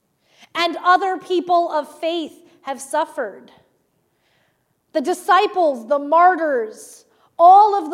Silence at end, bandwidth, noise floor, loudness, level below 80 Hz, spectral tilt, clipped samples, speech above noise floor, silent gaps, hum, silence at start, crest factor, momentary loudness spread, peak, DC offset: 0 s; 14.5 kHz; -66 dBFS; -17 LUFS; -80 dBFS; -2 dB/octave; under 0.1%; 49 dB; none; none; 0.55 s; 16 dB; 18 LU; -2 dBFS; under 0.1%